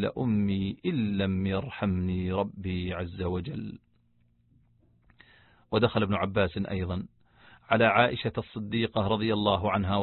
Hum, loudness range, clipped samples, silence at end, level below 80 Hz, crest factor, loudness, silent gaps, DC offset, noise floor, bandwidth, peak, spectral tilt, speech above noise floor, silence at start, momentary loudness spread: none; 7 LU; under 0.1%; 0 s; -46 dBFS; 24 dB; -28 LUFS; none; under 0.1%; -67 dBFS; 4.3 kHz; -6 dBFS; -10.5 dB/octave; 39 dB; 0 s; 10 LU